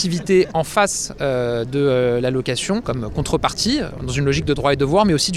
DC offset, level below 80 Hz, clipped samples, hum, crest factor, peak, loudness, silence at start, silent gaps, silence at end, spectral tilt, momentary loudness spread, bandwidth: under 0.1%; -38 dBFS; under 0.1%; none; 16 dB; -2 dBFS; -19 LUFS; 0 s; none; 0 s; -4.5 dB/octave; 6 LU; 15 kHz